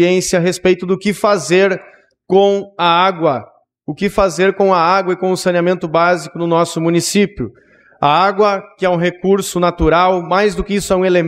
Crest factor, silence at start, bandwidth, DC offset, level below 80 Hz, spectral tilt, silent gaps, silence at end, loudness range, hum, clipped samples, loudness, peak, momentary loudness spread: 14 dB; 0 s; 15.5 kHz; under 0.1%; -38 dBFS; -5 dB/octave; none; 0 s; 1 LU; none; under 0.1%; -14 LUFS; 0 dBFS; 6 LU